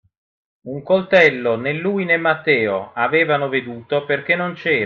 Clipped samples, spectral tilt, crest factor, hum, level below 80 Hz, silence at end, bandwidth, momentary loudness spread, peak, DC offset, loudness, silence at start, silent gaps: under 0.1%; -6.5 dB/octave; 18 dB; none; -64 dBFS; 0 s; 7 kHz; 10 LU; -2 dBFS; under 0.1%; -18 LUFS; 0.65 s; none